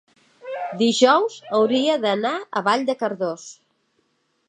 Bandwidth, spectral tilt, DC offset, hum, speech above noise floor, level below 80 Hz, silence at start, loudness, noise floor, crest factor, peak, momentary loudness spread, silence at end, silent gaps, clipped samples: 10.5 kHz; -4 dB/octave; under 0.1%; none; 48 dB; -78 dBFS; 0.45 s; -21 LUFS; -68 dBFS; 20 dB; -2 dBFS; 17 LU; 0.95 s; none; under 0.1%